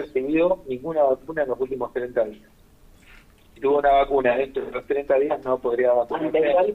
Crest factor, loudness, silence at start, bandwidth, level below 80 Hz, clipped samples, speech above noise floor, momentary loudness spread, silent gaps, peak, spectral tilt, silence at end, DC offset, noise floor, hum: 14 dB; -23 LUFS; 0 s; 5.6 kHz; -50 dBFS; under 0.1%; 30 dB; 9 LU; none; -8 dBFS; -7 dB/octave; 0 s; under 0.1%; -52 dBFS; none